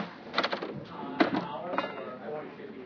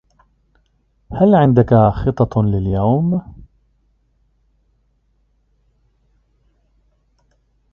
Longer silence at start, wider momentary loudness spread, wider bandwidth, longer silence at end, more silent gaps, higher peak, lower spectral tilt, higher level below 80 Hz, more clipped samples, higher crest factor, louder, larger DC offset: second, 0 s vs 1.1 s; first, 11 LU vs 8 LU; about the same, 5.4 kHz vs 5.4 kHz; second, 0 s vs 4.3 s; neither; second, -8 dBFS vs 0 dBFS; second, -6 dB/octave vs -11 dB/octave; second, -72 dBFS vs -38 dBFS; neither; first, 26 dB vs 18 dB; second, -33 LUFS vs -15 LUFS; neither